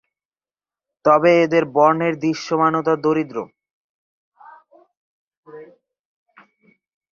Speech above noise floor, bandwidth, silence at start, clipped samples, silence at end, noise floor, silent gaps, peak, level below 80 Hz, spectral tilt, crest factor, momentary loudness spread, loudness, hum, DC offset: over 73 dB; 7.2 kHz; 1.05 s; under 0.1%; 1.5 s; under -90 dBFS; 3.73-4.32 s, 4.97-5.31 s, 5.37-5.43 s; -2 dBFS; -66 dBFS; -6.5 dB/octave; 20 dB; 11 LU; -17 LUFS; none; under 0.1%